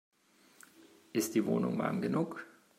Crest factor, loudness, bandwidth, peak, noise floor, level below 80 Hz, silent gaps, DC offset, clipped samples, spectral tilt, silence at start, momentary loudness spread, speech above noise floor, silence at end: 18 dB; -34 LUFS; 16 kHz; -18 dBFS; -64 dBFS; -80 dBFS; none; under 0.1%; under 0.1%; -6 dB/octave; 1.15 s; 7 LU; 32 dB; 0.3 s